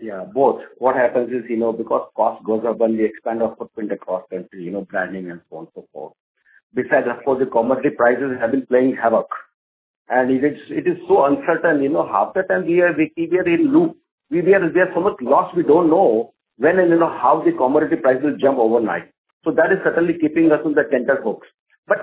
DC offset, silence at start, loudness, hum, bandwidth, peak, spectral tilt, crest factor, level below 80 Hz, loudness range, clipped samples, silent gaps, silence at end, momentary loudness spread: under 0.1%; 0 s; -18 LUFS; none; 4 kHz; -2 dBFS; -11 dB/octave; 16 dB; -62 dBFS; 7 LU; under 0.1%; 6.20-6.35 s, 6.63-6.70 s, 9.54-10.05 s, 14.11-14.18 s, 19.18-19.25 s, 19.33-19.41 s, 21.59-21.66 s, 21.78-21.83 s; 0 s; 12 LU